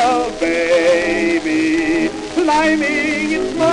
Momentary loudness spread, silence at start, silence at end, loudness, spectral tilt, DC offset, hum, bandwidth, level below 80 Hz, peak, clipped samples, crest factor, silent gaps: 5 LU; 0 s; 0 s; -16 LUFS; -4 dB/octave; under 0.1%; none; 11 kHz; -42 dBFS; -2 dBFS; under 0.1%; 14 dB; none